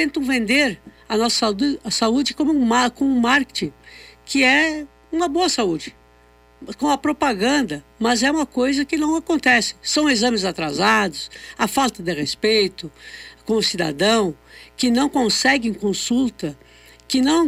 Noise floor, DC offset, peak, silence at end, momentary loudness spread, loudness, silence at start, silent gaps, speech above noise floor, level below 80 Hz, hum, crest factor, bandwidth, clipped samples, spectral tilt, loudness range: -52 dBFS; under 0.1%; -6 dBFS; 0 s; 12 LU; -19 LUFS; 0 s; none; 33 dB; -50 dBFS; 60 Hz at -50 dBFS; 14 dB; 16 kHz; under 0.1%; -3 dB/octave; 3 LU